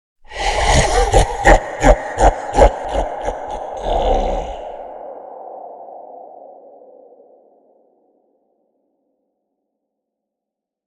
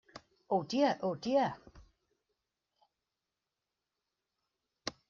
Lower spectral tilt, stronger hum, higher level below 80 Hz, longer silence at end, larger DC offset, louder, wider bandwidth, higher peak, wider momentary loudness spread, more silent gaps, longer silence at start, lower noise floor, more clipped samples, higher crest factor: about the same, -4.5 dB/octave vs -4 dB/octave; neither; first, -24 dBFS vs -72 dBFS; first, 4.35 s vs 0.2 s; neither; first, -16 LUFS vs -34 LUFS; first, 12 kHz vs 7.2 kHz; first, 0 dBFS vs -18 dBFS; first, 21 LU vs 14 LU; neither; first, 0.3 s vs 0.15 s; second, -83 dBFS vs -89 dBFS; neither; about the same, 18 dB vs 22 dB